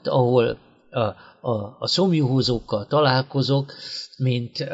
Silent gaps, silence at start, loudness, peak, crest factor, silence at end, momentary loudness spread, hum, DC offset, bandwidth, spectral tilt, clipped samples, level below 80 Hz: none; 0.05 s; -22 LUFS; -4 dBFS; 18 dB; 0 s; 12 LU; none; under 0.1%; 7.8 kHz; -6.5 dB/octave; under 0.1%; -52 dBFS